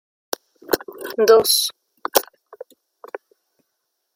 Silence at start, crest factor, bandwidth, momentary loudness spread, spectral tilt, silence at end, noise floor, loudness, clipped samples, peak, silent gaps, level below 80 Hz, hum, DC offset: 0.7 s; 22 dB; 16.5 kHz; 24 LU; -1 dB/octave; 1.95 s; -75 dBFS; -18 LUFS; under 0.1%; 0 dBFS; none; -64 dBFS; none; under 0.1%